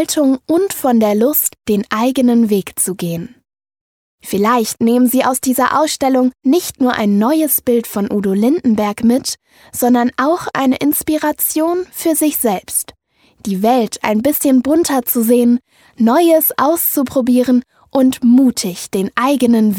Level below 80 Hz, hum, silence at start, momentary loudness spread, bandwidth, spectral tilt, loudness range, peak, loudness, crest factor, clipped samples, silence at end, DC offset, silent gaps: -52 dBFS; none; 0 s; 7 LU; 19.5 kHz; -4.5 dB/octave; 3 LU; 0 dBFS; -14 LUFS; 14 dB; under 0.1%; 0 s; under 0.1%; 3.81-4.18 s